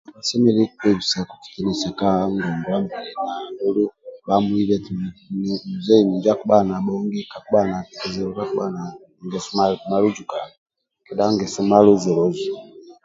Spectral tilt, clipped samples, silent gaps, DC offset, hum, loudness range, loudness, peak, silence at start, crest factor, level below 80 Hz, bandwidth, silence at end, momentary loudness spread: -6 dB/octave; under 0.1%; 10.58-10.66 s; under 0.1%; none; 4 LU; -21 LUFS; 0 dBFS; 0.1 s; 20 dB; -54 dBFS; 7.8 kHz; 0.15 s; 13 LU